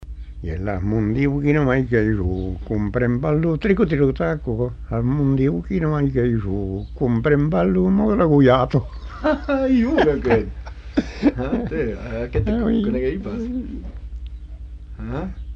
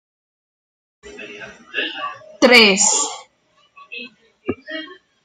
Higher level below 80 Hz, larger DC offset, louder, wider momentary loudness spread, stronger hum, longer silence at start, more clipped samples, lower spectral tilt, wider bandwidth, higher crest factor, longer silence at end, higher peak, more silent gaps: first, -32 dBFS vs -62 dBFS; neither; second, -20 LUFS vs -14 LUFS; second, 15 LU vs 27 LU; neither; second, 0 s vs 1.05 s; neither; first, -9 dB/octave vs -1.5 dB/octave; second, 7 kHz vs 13.5 kHz; about the same, 16 dB vs 20 dB; second, 0 s vs 0.3 s; second, -4 dBFS vs 0 dBFS; neither